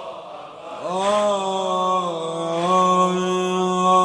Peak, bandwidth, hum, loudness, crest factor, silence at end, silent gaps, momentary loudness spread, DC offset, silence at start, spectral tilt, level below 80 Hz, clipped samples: -6 dBFS; 10.5 kHz; none; -20 LUFS; 14 dB; 0 s; none; 18 LU; under 0.1%; 0 s; -5 dB/octave; -64 dBFS; under 0.1%